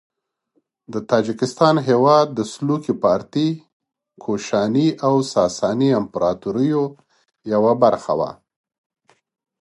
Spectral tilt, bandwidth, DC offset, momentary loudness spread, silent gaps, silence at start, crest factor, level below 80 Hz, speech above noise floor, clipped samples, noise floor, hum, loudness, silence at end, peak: -6.5 dB/octave; 11.5 kHz; under 0.1%; 11 LU; 3.73-3.80 s; 0.9 s; 18 dB; -58 dBFS; 50 dB; under 0.1%; -68 dBFS; none; -19 LUFS; 1.3 s; -2 dBFS